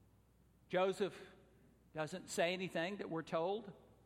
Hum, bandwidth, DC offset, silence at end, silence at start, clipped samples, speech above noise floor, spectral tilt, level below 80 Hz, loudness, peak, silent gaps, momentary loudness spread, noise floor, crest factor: none; 16 kHz; under 0.1%; 0.25 s; 0.7 s; under 0.1%; 30 dB; -4.5 dB/octave; -76 dBFS; -41 LUFS; -22 dBFS; none; 15 LU; -70 dBFS; 20 dB